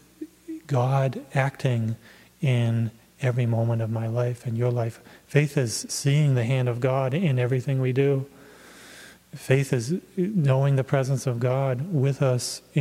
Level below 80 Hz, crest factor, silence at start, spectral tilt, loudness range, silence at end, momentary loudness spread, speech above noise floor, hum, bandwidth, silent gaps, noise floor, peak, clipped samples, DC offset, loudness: -64 dBFS; 20 dB; 0.2 s; -6.5 dB/octave; 2 LU; 0 s; 10 LU; 24 dB; none; 14 kHz; none; -48 dBFS; -4 dBFS; under 0.1%; under 0.1%; -25 LUFS